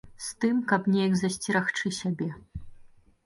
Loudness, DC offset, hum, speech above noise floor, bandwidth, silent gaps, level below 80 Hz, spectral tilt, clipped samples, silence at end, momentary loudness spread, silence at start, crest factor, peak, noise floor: -27 LUFS; under 0.1%; none; 26 dB; 11.5 kHz; none; -54 dBFS; -5 dB/octave; under 0.1%; 0.4 s; 16 LU; 0.05 s; 20 dB; -8 dBFS; -53 dBFS